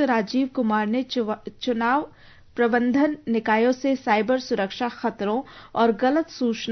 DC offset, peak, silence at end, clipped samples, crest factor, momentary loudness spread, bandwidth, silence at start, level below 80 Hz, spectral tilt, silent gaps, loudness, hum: under 0.1%; -8 dBFS; 0 s; under 0.1%; 16 dB; 7 LU; 6.4 kHz; 0 s; -60 dBFS; -5.5 dB/octave; none; -23 LUFS; none